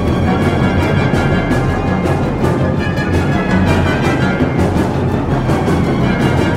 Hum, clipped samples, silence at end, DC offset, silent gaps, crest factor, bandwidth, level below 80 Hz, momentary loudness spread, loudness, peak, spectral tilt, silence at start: none; under 0.1%; 0 s; under 0.1%; none; 14 dB; 14.5 kHz; -28 dBFS; 2 LU; -14 LUFS; 0 dBFS; -7.5 dB/octave; 0 s